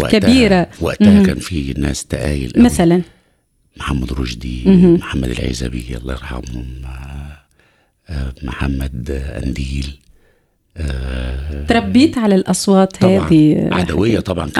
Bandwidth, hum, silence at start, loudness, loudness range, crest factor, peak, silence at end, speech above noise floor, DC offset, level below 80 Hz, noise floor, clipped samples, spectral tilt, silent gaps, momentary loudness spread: 14 kHz; none; 0 s; -15 LUFS; 12 LU; 14 dB; 0 dBFS; 0 s; 45 dB; under 0.1%; -28 dBFS; -59 dBFS; under 0.1%; -6 dB/octave; none; 17 LU